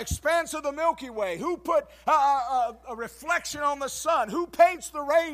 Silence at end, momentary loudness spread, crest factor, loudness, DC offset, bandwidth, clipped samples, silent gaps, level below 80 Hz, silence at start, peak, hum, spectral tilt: 0 s; 10 LU; 20 dB; -26 LUFS; under 0.1%; 15.5 kHz; under 0.1%; none; -50 dBFS; 0 s; -6 dBFS; none; -3.5 dB/octave